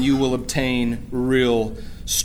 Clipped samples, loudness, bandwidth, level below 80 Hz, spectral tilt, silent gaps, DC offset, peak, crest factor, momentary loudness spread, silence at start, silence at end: under 0.1%; -21 LUFS; 16 kHz; -36 dBFS; -4 dB/octave; none; under 0.1%; -6 dBFS; 14 dB; 7 LU; 0 s; 0 s